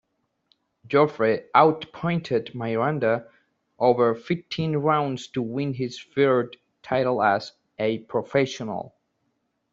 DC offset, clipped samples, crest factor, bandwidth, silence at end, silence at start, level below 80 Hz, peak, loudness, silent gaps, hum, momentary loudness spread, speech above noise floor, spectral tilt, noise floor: under 0.1%; under 0.1%; 22 dB; 7.8 kHz; 0.9 s; 0.9 s; -64 dBFS; -2 dBFS; -24 LUFS; none; none; 9 LU; 51 dB; -6.5 dB/octave; -74 dBFS